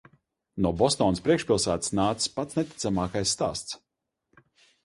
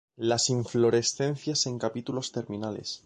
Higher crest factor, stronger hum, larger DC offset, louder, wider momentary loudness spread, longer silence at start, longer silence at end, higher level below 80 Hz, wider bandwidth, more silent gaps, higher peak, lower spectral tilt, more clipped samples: about the same, 20 dB vs 16 dB; neither; neither; about the same, -26 LUFS vs -28 LUFS; about the same, 10 LU vs 10 LU; first, 0.55 s vs 0.2 s; first, 1.1 s vs 0.1 s; first, -50 dBFS vs -64 dBFS; about the same, 11.5 kHz vs 10.5 kHz; neither; first, -8 dBFS vs -12 dBFS; about the same, -4.5 dB/octave vs -4 dB/octave; neither